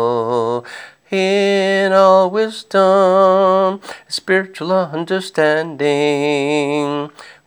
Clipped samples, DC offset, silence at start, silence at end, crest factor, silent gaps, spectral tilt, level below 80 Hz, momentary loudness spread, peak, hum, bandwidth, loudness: under 0.1%; under 0.1%; 0 s; 0.15 s; 14 dB; none; -5 dB/octave; -74 dBFS; 13 LU; 0 dBFS; none; over 20 kHz; -15 LUFS